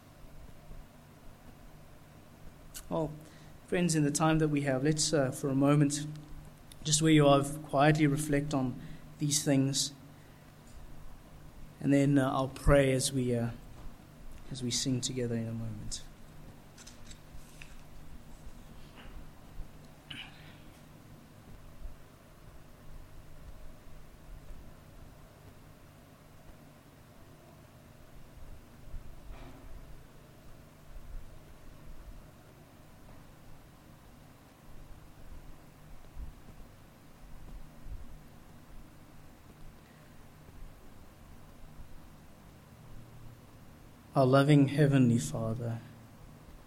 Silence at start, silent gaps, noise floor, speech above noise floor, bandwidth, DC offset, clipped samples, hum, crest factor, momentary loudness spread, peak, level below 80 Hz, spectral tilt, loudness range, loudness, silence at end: 0.25 s; none; -56 dBFS; 27 dB; 16 kHz; under 0.1%; under 0.1%; none; 24 dB; 28 LU; -12 dBFS; -50 dBFS; -5 dB/octave; 26 LU; -29 LUFS; 0.05 s